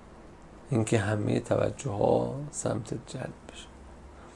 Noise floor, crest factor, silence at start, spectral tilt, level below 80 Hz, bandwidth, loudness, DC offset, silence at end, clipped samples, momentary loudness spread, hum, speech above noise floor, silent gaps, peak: -49 dBFS; 22 dB; 0 s; -6 dB/octave; -54 dBFS; 11.5 kHz; -30 LUFS; under 0.1%; 0 s; under 0.1%; 24 LU; none; 20 dB; none; -8 dBFS